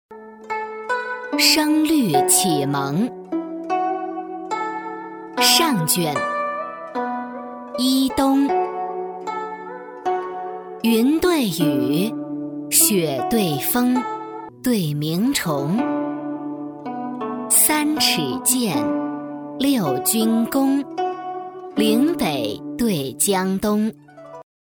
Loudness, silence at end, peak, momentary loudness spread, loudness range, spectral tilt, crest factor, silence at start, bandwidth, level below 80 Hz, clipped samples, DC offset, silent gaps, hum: -20 LUFS; 0.3 s; 0 dBFS; 15 LU; 4 LU; -3.5 dB/octave; 20 dB; 0.1 s; over 20 kHz; -54 dBFS; under 0.1%; under 0.1%; none; none